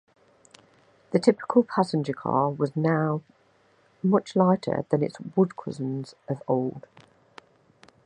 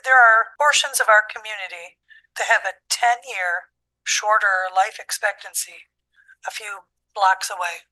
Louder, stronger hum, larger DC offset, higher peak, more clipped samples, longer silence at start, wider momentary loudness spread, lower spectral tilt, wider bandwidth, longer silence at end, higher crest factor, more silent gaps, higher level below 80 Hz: second, -26 LUFS vs -19 LUFS; neither; neither; about the same, -4 dBFS vs -2 dBFS; neither; first, 1.1 s vs 0.05 s; second, 11 LU vs 17 LU; first, -8 dB/octave vs 4 dB/octave; second, 10 kHz vs 13 kHz; first, 1.25 s vs 0.15 s; about the same, 22 dB vs 18 dB; neither; first, -70 dBFS vs -76 dBFS